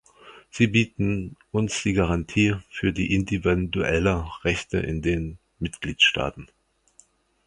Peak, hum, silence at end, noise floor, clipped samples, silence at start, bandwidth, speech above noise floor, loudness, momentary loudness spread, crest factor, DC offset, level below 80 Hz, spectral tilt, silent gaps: -6 dBFS; none; 1 s; -59 dBFS; under 0.1%; 0.25 s; 11 kHz; 35 dB; -24 LUFS; 12 LU; 18 dB; under 0.1%; -40 dBFS; -5 dB/octave; none